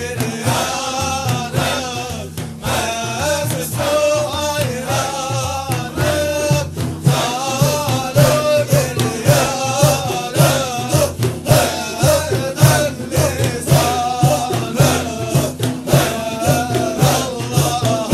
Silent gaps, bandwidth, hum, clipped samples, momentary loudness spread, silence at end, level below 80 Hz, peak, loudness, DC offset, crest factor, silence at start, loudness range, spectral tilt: none; 16 kHz; none; under 0.1%; 6 LU; 0 s; -38 dBFS; 0 dBFS; -17 LUFS; under 0.1%; 16 dB; 0 s; 4 LU; -4.5 dB/octave